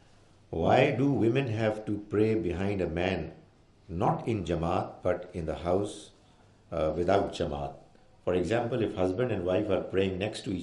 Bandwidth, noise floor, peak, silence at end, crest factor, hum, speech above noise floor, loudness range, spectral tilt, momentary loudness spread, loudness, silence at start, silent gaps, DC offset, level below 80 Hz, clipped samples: 11.5 kHz; -59 dBFS; -10 dBFS; 0 s; 20 dB; none; 30 dB; 4 LU; -7 dB/octave; 10 LU; -30 LUFS; 0.5 s; none; under 0.1%; -54 dBFS; under 0.1%